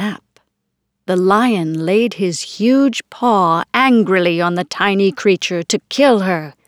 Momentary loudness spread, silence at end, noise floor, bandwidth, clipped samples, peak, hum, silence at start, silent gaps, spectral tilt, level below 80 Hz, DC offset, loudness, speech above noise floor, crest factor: 7 LU; 0.15 s; -73 dBFS; 15 kHz; under 0.1%; 0 dBFS; none; 0 s; none; -5 dB/octave; -66 dBFS; under 0.1%; -15 LUFS; 58 dB; 16 dB